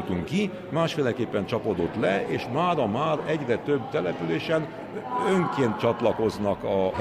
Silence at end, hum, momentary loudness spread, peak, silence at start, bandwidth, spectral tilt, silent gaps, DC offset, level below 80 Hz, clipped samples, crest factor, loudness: 0 s; none; 4 LU; -8 dBFS; 0 s; 14.5 kHz; -6.5 dB/octave; none; under 0.1%; -58 dBFS; under 0.1%; 18 dB; -26 LUFS